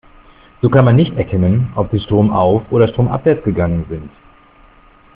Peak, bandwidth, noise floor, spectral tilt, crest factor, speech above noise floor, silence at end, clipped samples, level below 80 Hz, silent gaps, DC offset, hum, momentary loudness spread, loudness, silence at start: 0 dBFS; 3.9 kHz; -46 dBFS; -8 dB/octave; 14 dB; 32 dB; 1.1 s; under 0.1%; -38 dBFS; none; under 0.1%; none; 7 LU; -14 LUFS; 0.65 s